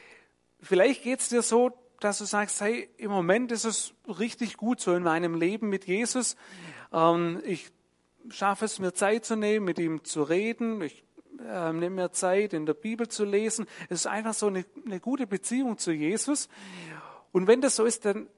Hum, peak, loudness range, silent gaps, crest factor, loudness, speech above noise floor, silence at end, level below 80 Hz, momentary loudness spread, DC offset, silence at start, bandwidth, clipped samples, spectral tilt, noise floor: none; -8 dBFS; 3 LU; none; 22 dB; -28 LUFS; 35 dB; 0.1 s; -80 dBFS; 12 LU; under 0.1%; 0.65 s; 11.5 kHz; under 0.1%; -4 dB/octave; -63 dBFS